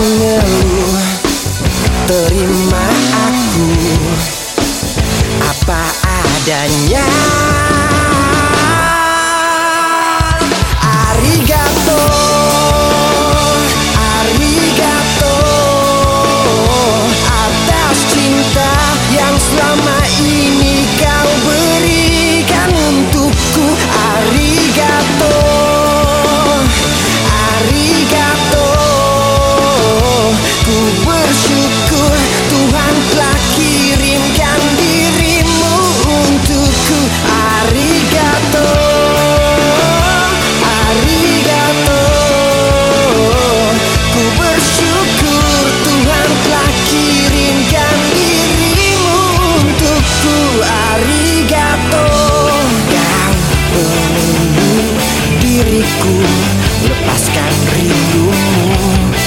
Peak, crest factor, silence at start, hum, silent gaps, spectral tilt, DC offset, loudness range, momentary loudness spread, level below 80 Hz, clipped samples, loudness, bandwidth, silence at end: 0 dBFS; 10 dB; 0 s; none; none; -4 dB/octave; under 0.1%; 1 LU; 2 LU; -20 dBFS; under 0.1%; -10 LUFS; 17 kHz; 0 s